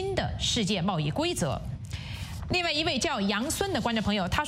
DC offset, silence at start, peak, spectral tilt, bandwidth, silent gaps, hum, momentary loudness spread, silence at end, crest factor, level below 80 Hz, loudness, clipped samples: under 0.1%; 0 s; -10 dBFS; -4 dB/octave; 16 kHz; none; none; 11 LU; 0 s; 18 dB; -44 dBFS; -28 LUFS; under 0.1%